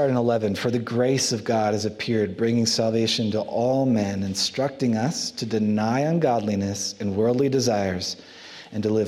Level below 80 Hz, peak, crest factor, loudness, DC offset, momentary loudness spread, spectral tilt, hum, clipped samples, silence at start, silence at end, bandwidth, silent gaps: -64 dBFS; -8 dBFS; 16 dB; -23 LUFS; under 0.1%; 6 LU; -5 dB/octave; none; under 0.1%; 0 s; 0 s; 15 kHz; none